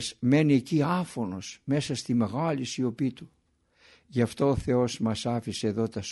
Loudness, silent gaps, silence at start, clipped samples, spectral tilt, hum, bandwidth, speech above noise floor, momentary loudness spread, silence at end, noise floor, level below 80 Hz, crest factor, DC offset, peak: -28 LUFS; none; 0 s; under 0.1%; -6 dB/octave; none; 11.5 kHz; 38 dB; 9 LU; 0 s; -65 dBFS; -54 dBFS; 16 dB; under 0.1%; -10 dBFS